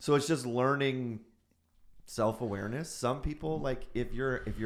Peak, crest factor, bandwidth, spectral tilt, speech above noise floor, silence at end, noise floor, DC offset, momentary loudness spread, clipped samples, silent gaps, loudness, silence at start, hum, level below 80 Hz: -14 dBFS; 20 dB; 15.5 kHz; -5.5 dB/octave; 36 dB; 0 s; -69 dBFS; under 0.1%; 9 LU; under 0.1%; none; -33 LUFS; 0 s; none; -46 dBFS